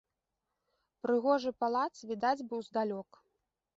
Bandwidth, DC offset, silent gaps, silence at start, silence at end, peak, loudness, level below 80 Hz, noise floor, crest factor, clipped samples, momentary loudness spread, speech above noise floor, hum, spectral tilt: 7.8 kHz; under 0.1%; none; 1.05 s; 0.75 s; -16 dBFS; -34 LUFS; -80 dBFS; -87 dBFS; 20 dB; under 0.1%; 8 LU; 54 dB; none; -5.5 dB/octave